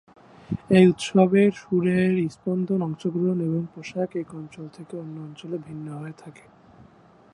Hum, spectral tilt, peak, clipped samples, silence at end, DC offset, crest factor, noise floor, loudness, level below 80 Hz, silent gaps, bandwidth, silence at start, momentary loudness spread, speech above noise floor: none; -7.5 dB/octave; -4 dBFS; under 0.1%; 1.05 s; under 0.1%; 20 dB; -53 dBFS; -23 LUFS; -62 dBFS; none; 11 kHz; 0.5 s; 20 LU; 30 dB